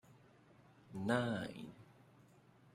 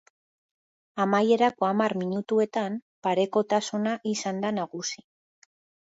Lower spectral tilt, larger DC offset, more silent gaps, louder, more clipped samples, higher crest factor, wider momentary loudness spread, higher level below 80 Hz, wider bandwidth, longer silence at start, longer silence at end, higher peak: first, -6.5 dB/octave vs -5 dB/octave; neither; second, none vs 2.82-3.02 s; second, -41 LUFS vs -26 LUFS; neither; first, 24 dB vs 18 dB; first, 24 LU vs 10 LU; about the same, -76 dBFS vs -76 dBFS; first, 15 kHz vs 8 kHz; second, 0.1 s vs 0.95 s; about the same, 0.85 s vs 0.9 s; second, -20 dBFS vs -10 dBFS